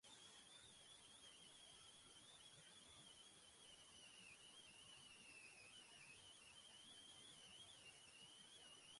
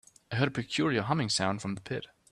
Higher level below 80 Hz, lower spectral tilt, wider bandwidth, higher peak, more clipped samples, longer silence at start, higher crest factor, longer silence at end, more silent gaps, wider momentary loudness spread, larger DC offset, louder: second, -88 dBFS vs -64 dBFS; second, -0.5 dB/octave vs -4.5 dB/octave; about the same, 11.5 kHz vs 12 kHz; second, -52 dBFS vs -12 dBFS; neither; second, 0.05 s vs 0.3 s; second, 14 dB vs 20 dB; second, 0 s vs 0.25 s; neither; second, 2 LU vs 9 LU; neither; second, -63 LUFS vs -31 LUFS